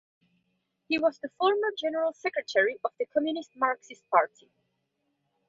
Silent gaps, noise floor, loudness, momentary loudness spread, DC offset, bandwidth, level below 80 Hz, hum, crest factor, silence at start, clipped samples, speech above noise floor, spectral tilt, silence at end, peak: none; -78 dBFS; -28 LUFS; 7 LU; under 0.1%; 7.6 kHz; -78 dBFS; none; 22 dB; 0.9 s; under 0.1%; 50 dB; -3.5 dB/octave; 1.25 s; -8 dBFS